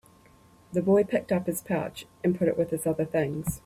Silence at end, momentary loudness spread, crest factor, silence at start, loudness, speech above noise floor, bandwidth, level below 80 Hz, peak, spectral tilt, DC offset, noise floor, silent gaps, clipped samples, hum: 0.1 s; 7 LU; 16 dB; 0.7 s; -27 LUFS; 30 dB; 15.5 kHz; -56 dBFS; -12 dBFS; -6.5 dB/octave; under 0.1%; -57 dBFS; none; under 0.1%; none